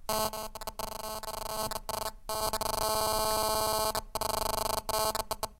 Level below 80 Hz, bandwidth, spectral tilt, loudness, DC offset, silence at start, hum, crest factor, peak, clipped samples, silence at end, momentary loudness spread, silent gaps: -46 dBFS; 16.5 kHz; -2 dB/octave; -32 LUFS; under 0.1%; 0 s; none; 18 dB; -14 dBFS; under 0.1%; 0.05 s; 9 LU; none